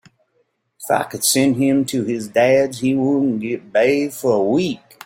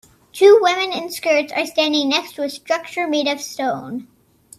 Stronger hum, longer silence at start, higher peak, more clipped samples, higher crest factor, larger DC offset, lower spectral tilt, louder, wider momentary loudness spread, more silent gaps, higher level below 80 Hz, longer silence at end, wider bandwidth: neither; first, 0.8 s vs 0.35 s; about the same, -2 dBFS vs 0 dBFS; neither; about the same, 16 dB vs 18 dB; neither; first, -4.5 dB/octave vs -2.5 dB/octave; about the same, -18 LUFS vs -18 LUFS; second, 6 LU vs 15 LU; neither; first, -60 dBFS vs -68 dBFS; second, 0.3 s vs 0.55 s; first, 16.5 kHz vs 14.5 kHz